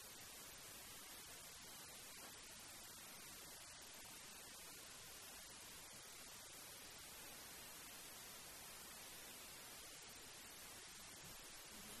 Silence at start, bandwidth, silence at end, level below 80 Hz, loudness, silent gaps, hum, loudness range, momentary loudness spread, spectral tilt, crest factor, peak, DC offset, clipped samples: 0 s; 13.5 kHz; 0 s; -76 dBFS; -55 LUFS; none; none; 1 LU; 1 LU; -1 dB/octave; 16 dB; -42 dBFS; under 0.1%; under 0.1%